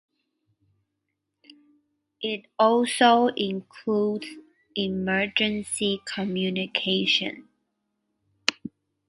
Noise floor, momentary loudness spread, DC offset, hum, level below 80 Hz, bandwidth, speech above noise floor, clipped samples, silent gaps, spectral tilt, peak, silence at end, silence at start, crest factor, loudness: -80 dBFS; 14 LU; under 0.1%; none; -64 dBFS; 11.5 kHz; 56 dB; under 0.1%; none; -4 dB/octave; 0 dBFS; 0.4 s; 2.2 s; 26 dB; -25 LUFS